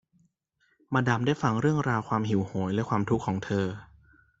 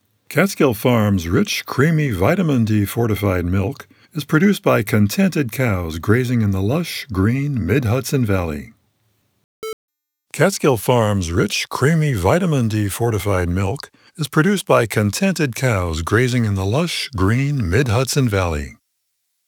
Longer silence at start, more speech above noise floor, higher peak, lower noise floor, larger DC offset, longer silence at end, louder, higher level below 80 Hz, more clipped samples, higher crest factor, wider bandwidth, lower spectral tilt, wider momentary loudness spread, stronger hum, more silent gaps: first, 0.9 s vs 0.3 s; second, 45 dB vs 54 dB; second, -8 dBFS vs 0 dBFS; about the same, -72 dBFS vs -71 dBFS; neither; second, 0.55 s vs 0.75 s; second, -28 LUFS vs -18 LUFS; second, -58 dBFS vs -40 dBFS; neither; about the same, 20 dB vs 18 dB; second, 7.8 kHz vs over 20 kHz; about the same, -7 dB/octave vs -6 dB/octave; second, 5 LU vs 8 LU; neither; second, none vs 9.44-9.62 s, 9.73-9.88 s